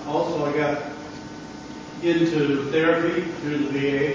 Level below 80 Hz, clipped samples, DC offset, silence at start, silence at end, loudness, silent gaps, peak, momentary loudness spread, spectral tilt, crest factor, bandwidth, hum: -56 dBFS; under 0.1%; under 0.1%; 0 s; 0 s; -23 LUFS; none; -8 dBFS; 17 LU; -6.5 dB/octave; 16 dB; 7.6 kHz; none